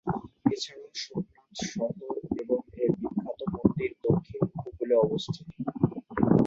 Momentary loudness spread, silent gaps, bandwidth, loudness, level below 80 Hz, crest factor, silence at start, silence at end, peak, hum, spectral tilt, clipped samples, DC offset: 11 LU; none; 7.8 kHz; -30 LUFS; -54 dBFS; 24 dB; 0.05 s; 0 s; -6 dBFS; none; -7 dB/octave; under 0.1%; under 0.1%